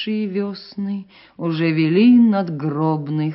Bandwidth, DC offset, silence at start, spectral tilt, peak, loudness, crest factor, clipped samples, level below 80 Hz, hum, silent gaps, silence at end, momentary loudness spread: 5.8 kHz; under 0.1%; 0 s; -6.5 dB/octave; -4 dBFS; -18 LUFS; 14 dB; under 0.1%; -66 dBFS; none; none; 0 s; 15 LU